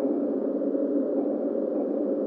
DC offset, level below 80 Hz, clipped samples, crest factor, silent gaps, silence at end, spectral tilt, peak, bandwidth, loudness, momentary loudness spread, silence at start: under 0.1%; -88 dBFS; under 0.1%; 12 dB; none; 0 s; -11.5 dB/octave; -14 dBFS; 2.4 kHz; -27 LUFS; 2 LU; 0 s